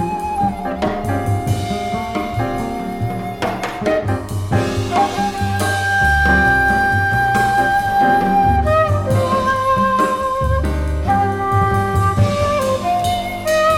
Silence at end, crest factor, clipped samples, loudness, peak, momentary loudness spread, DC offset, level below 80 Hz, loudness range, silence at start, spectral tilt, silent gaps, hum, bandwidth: 0 s; 14 dB; under 0.1%; -17 LUFS; -2 dBFS; 8 LU; under 0.1%; -28 dBFS; 7 LU; 0 s; -6 dB/octave; none; none; 16.5 kHz